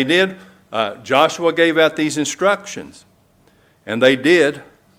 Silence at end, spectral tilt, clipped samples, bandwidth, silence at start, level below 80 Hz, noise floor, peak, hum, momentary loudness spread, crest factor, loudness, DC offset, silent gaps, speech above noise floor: 0.35 s; -4 dB/octave; under 0.1%; 16 kHz; 0 s; -62 dBFS; -54 dBFS; 0 dBFS; none; 13 LU; 18 dB; -16 LUFS; under 0.1%; none; 38 dB